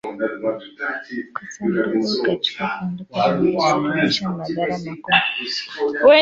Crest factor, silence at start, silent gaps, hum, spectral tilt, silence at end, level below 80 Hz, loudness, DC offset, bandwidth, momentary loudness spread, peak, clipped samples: 18 dB; 0.05 s; none; none; -5 dB/octave; 0 s; -58 dBFS; -21 LUFS; under 0.1%; 7.8 kHz; 10 LU; -2 dBFS; under 0.1%